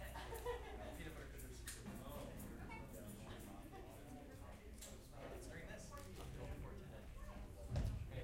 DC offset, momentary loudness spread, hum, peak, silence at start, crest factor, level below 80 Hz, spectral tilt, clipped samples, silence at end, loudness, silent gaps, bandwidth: under 0.1%; 9 LU; none; -30 dBFS; 0 s; 20 dB; -56 dBFS; -5 dB/octave; under 0.1%; 0 s; -53 LUFS; none; 16 kHz